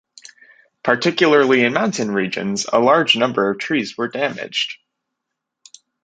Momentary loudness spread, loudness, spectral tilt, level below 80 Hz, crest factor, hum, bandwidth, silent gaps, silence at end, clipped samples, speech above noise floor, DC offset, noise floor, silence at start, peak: 9 LU; -17 LUFS; -4 dB/octave; -64 dBFS; 18 dB; none; 9.4 kHz; none; 1.3 s; under 0.1%; 63 dB; under 0.1%; -80 dBFS; 0.85 s; 0 dBFS